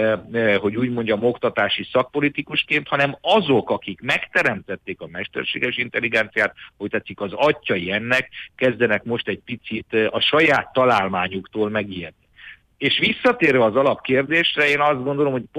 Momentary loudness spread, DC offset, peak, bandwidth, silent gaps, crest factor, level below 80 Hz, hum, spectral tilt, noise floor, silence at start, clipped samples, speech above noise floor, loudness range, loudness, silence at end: 11 LU; under 0.1%; -6 dBFS; 13 kHz; none; 16 dB; -58 dBFS; none; -5.5 dB/octave; -45 dBFS; 0 s; under 0.1%; 24 dB; 3 LU; -20 LUFS; 0 s